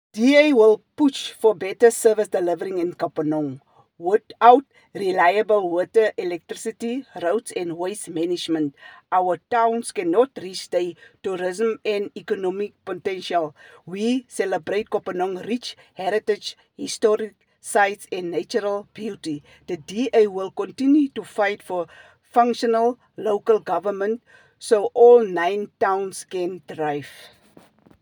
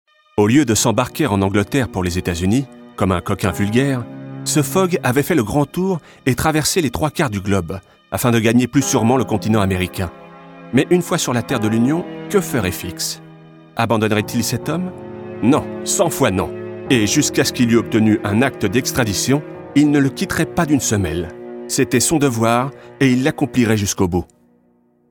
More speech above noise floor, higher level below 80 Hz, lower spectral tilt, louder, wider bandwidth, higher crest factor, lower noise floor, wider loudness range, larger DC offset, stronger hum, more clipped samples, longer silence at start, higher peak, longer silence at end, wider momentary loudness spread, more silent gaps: second, 32 dB vs 40 dB; second, -74 dBFS vs -44 dBFS; about the same, -4.5 dB/octave vs -5 dB/octave; second, -22 LUFS vs -17 LUFS; about the same, over 20 kHz vs 19 kHz; about the same, 20 dB vs 16 dB; second, -53 dBFS vs -57 dBFS; first, 6 LU vs 3 LU; neither; neither; neither; second, 0.15 s vs 0.35 s; about the same, 0 dBFS vs -2 dBFS; about the same, 0.75 s vs 0.85 s; first, 14 LU vs 9 LU; neither